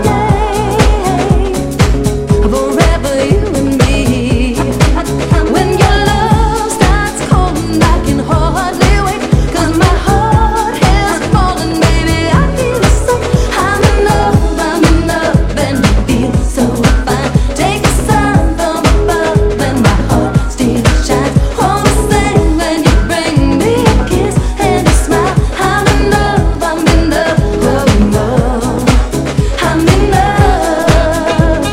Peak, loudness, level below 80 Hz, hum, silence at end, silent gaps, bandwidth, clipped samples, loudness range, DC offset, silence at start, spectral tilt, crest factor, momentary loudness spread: 0 dBFS; -11 LUFS; -16 dBFS; none; 0 s; none; 15.5 kHz; 0.3%; 1 LU; under 0.1%; 0 s; -5.5 dB/octave; 10 dB; 3 LU